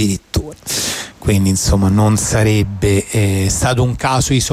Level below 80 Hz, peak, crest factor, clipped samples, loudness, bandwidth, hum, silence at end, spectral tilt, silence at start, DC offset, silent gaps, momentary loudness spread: -28 dBFS; -4 dBFS; 10 dB; under 0.1%; -15 LUFS; 16 kHz; none; 0 s; -5 dB/octave; 0 s; under 0.1%; none; 7 LU